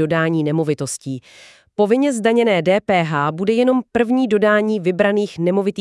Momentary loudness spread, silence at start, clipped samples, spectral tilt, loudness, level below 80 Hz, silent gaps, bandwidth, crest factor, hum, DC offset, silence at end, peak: 7 LU; 0 s; under 0.1%; -6 dB/octave; -17 LUFS; -60 dBFS; none; 12 kHz; 14 dB; none; under 0.1%; 0 s; -4 dBFS